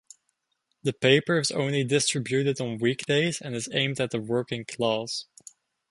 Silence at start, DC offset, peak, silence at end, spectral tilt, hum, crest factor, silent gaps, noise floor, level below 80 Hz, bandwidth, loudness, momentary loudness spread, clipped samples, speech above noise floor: 0.85 s; under 0.1%; -4 dBFS; 0.65 s; -4 dB/octave; none; 22 dB; none; -77 dBFS; -66 dBFS; 11.5 kHz; -26 LUFS; 11 LU; under 0.1%; 51 dB